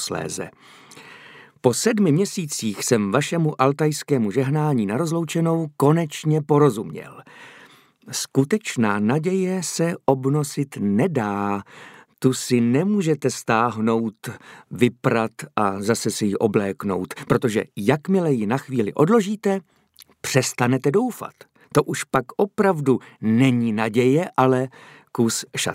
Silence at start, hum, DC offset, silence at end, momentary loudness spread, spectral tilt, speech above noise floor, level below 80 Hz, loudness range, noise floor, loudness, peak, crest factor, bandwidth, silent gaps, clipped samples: 0 s; none; under 0.1%; 0 s; 9 LU; -5.5 dB/octave; 29 dB; -62 dBFS; 2 LU; -50 dBFS; -21 LUFS; -2 dBFS; 18 dB; 16 kHz; none; under 0.1%